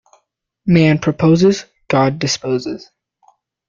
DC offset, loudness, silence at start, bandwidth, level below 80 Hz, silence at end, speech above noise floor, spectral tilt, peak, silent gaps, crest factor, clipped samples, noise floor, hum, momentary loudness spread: under 0.1%; -15 LUFS; 0.65 s; 7.6 kHz; -50 dBFS; 0.9 s; 52 dB; -6 dB/octave; -2 dBFS; none; 14 dB; under 0.1%; -66 dBFS; none; 13 LU